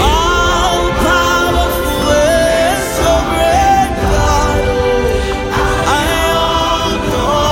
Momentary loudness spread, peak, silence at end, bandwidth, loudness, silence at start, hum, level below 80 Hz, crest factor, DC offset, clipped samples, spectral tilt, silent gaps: 4 LU; 0 dBFS; 0 s; 17 kHz; -12 LUFS; 0 s; none; -20 dBFS; 12 dB; under 0.1%; under 0.1%; -4 dB/octave; none